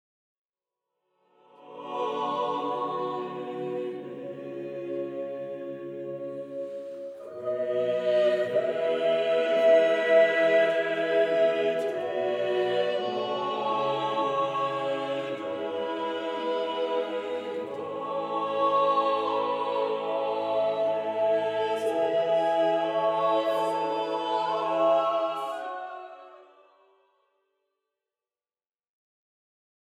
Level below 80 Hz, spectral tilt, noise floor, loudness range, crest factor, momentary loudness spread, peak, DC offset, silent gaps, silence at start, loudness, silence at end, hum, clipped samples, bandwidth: -84 dBFS; -5 dB/octave; under -90 dBFS; 11 LU; 18 dB; 13 LU; -10 dBFS; under 0.1%; none; 1.6 s; -27 LUFS; 3.55 s; none; under 0.1%; 11 kHz